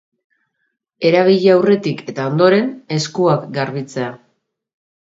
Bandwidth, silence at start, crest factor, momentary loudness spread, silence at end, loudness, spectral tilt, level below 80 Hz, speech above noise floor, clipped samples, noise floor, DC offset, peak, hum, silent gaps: 7.8 kHz; 1 s; 16 dB; 11 LU; 0.9 s; -16 LUFS; -6 dB/octave; -64 dBFS; 56 dB; under 0.1%; -71 dBFS; under 0.1%; 0 dBFS; none; none